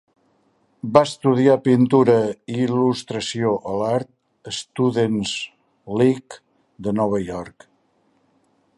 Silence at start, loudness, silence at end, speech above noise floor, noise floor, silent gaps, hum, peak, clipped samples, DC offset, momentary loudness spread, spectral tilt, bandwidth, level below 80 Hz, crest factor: 0.85 s; -20 LUFS; 1.3 s; 44 dB; -63 dBFS; none; none; 0 dBFS; under 0.1%; under 0.1%; 15 LU; -6 dB/octave; 11.5 kHz; -56 dBFS; 20 dB